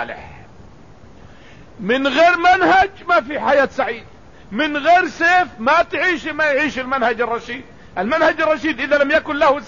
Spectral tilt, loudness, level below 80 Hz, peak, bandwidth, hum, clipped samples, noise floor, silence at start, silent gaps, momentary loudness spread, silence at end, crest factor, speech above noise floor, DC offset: -4.5 dB/octave; -16 LUFS; -48 dBFS; -4 dBFS; 7.4 kHz; none; under 0.1%; -43 dBFS; 0 s; none; 13 LU; 0 s; 14 dB; 27 dB; 0.6%